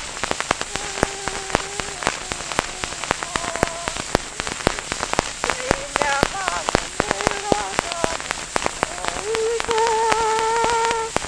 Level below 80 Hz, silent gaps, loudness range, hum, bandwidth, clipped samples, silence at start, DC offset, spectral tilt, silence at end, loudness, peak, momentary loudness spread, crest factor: -40 dBFS; none; 3 LU; none; 11 kHz; under 0.1%; 0 s; under 0.1%; -2.5 dB/octave; 0 s; -22 LUFS; 0 dBFS; 6 LU; 24 dB